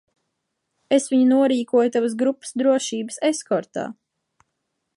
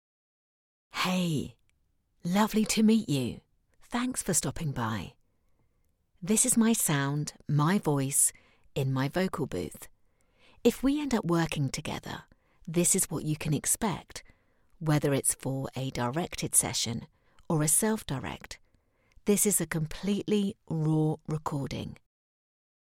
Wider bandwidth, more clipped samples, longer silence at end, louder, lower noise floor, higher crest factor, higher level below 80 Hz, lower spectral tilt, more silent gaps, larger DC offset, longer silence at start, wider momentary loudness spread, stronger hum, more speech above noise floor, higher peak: second, 11.5 kHz vs 17 kHz; neither; about the same, 1.05 s vs 1.05 s; first, -21 LUFS vs -28 LUFS; first, -77 dBFS vs -72 dBFS; second, 16 dB vs 22 dB; second, -76 dBFS vs -54 dBFS; about the same, -4 dB/octave vs -4.5 dB/octave; neither; neither; about the same, 0.9 s vs 0.95 s; second, 10 LU vs 15 LU; neither; first, 57 dB vs 43 dB; about the same, -6 dBFS vs -8 dBFS